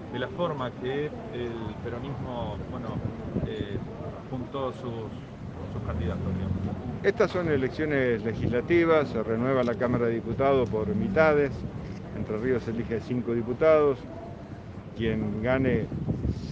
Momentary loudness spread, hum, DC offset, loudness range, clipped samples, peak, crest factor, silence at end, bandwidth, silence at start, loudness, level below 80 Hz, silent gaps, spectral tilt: 14 LU; none; under 0.1%; 9 LU; under 0.1%; -6 dBFS; 22 dB; 0 s; 7.8 kHz; 0 s; -28 LUFS; -46 dBFS; none; -8.5 dB/octave